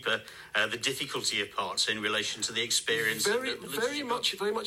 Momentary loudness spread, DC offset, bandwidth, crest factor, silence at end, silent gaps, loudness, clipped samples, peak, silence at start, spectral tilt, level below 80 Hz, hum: 5 LU; under 0.1%; 16 kHz; 18 dB; 0 s; none; -29 LUFS; under 0.1%; -12 dBFS; 0 s; -1 dB/octave; -70 dBFS; none